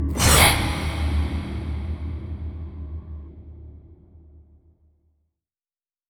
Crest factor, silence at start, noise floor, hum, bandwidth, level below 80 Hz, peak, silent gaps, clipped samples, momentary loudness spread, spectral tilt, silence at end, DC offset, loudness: 24 dB; 0 s; under -90 dBFS; none; over 20 kHz; -30 dBFS; -2 dBFS; none; under 0.1%; 26 LU; -3.5 dB/octave; 1.7 s; under 0.1%; -21 LUFS